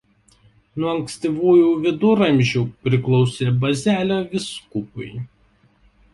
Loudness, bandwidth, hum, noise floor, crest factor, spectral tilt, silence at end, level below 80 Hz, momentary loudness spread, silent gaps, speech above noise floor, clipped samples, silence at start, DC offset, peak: -19 LUFS; 11.5 kHz; none; -58 dBFS; 16 dB; -6.5 dB/octave; 0.85 s; -54 dBFS; 17 LU; none; 39 dB; under 0.1%; 0.75 s; under 0.1%; -4 dBFS